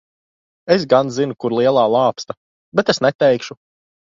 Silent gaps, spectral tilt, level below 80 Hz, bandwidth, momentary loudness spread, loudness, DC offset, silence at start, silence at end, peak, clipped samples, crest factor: 2.37-2.72 s, 3.15-3.19 s; -5.5 dB/octave; -58 dBFS; 7.6 kHz; 17 LU; -17 LUFS; under 0.1%; 0.65 s; 0.65 s; 0 dBFS; under 0.1%; 18 dB